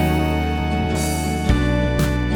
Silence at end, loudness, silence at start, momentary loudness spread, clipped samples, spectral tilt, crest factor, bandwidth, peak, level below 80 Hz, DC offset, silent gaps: 0 s; -20 LUFS; 0 s; 3 LU; under 0.1%; -6 dB/octave; 16 dB; over 20 kHz; -2 dBFS; -24 dBFS; under 0.1%; none